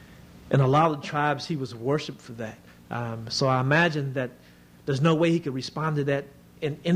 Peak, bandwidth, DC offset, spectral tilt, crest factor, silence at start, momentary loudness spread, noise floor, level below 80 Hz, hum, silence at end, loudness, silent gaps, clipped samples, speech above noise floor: -8 dBFS; 10.5 kHz; under 0.1%; -6.5 dB/octave; 18 dB; 0 s; 15 LU; -48 dBFS; -60 dBFS; none; 0 s; -26 LUFS; none; under 0.1%; 23 dB